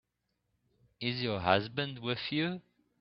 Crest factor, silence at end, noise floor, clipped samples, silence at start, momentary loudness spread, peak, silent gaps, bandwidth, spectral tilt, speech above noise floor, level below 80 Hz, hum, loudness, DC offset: 26 dB; 0.4 s; -82 dBFS; under 0.1%; 1 s; 8 LU; -8 dBFS; none; 6 kHz; -8.5 dB/octave; 49 dB; -68 dBFS; none; -33 LUFS; under 0.1%